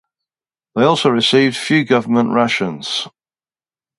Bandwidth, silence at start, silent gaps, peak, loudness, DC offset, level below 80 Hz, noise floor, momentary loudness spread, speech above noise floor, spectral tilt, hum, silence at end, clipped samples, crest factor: 11.5 kHz; 0.75 s; none; 0 dBFS; -15 LUFS; under 0.1%; -62 dBFS; under -90 dBFS; 9 LU; over 75 dB; -5 dB/octave; none; 0.9 s; under 0.1%; 16 dB